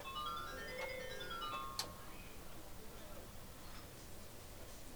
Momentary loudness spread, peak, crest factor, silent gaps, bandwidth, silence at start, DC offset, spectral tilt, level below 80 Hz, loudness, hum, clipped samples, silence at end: 10 LU; -24 dBFS; 24 dB; none; over 20 kHz; 0 s; under 0.1%; -3 dB/octave; -58 dBFS; -48 LUFS; none; under 0.1%; 0 s